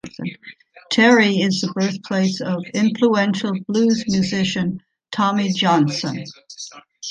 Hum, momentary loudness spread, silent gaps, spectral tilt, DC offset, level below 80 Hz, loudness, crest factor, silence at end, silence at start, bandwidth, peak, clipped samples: none; 19 LU; none; -5 dB/octave; under 0.1%; -60 dBFS; -18 LUFS; 18 dB; 0 s; 0.05 s; 9.6 kHz; -2 dBFS; under 0.1%